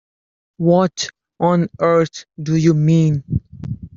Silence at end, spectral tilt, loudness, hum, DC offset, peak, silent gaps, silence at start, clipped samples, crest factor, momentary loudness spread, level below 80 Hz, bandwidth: 0.1 s; -7 dB/octave; -17 LUFS; none; under 0.1%; -2 dBFS; none; 0.6 s; under 0.1%; 14 dB; 12 LU; -44 dBFS; 7.6 kHz